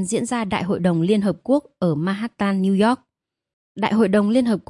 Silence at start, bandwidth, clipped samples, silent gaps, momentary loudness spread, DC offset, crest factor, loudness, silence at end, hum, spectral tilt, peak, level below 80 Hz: 0 s; 11.5 kHz; under 0.1%; 3.53-3.75 s; 6 LU; under 0.1%; 16 dB; -20 LUFS; 0.1 s; none; -6.5 dB/octave; -4 dBFS; -58 dBFS